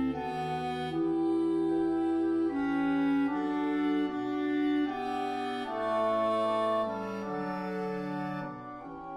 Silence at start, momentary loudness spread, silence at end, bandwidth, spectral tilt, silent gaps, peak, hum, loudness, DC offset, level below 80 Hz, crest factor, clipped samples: 0 s; 7 LU; 0 s; 11 kHz; -7 dB/octave; none; -20 dBFS; none; -31 LUFS; under 0.1%; -62 dBFS; 12 dB; under 0.1%